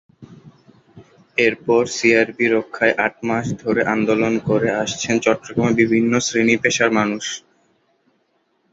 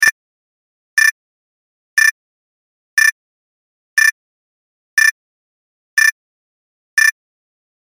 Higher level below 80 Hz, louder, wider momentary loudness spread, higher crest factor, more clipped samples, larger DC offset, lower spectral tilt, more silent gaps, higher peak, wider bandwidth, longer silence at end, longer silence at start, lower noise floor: first, -56 dBFS vs -70 dBFS; second, -18 LUFS vs -14 LUFS; about the same, 6 LU vs 6 LU; about the same, 18 dB vs 18 dB; neither; neither; first, -4.5 dB/octave vs 4.5 dB/octave; second, none vs 0.12-0.97 s, 1.11-1.97 s, 2.11-2.97 s, 3.12-3.97 s, 4.12-4.97 s, 5.11-5.97 s, 6.12-6.97 s; about the same, -2 dBFS vs 0 dBFS; second, 8 kHz vs 16.5 kHz; first, 1.35 s vs 0.8 s; first, 0.2 s vs 0 s; second, -65 dBFS vs under -90 dBFS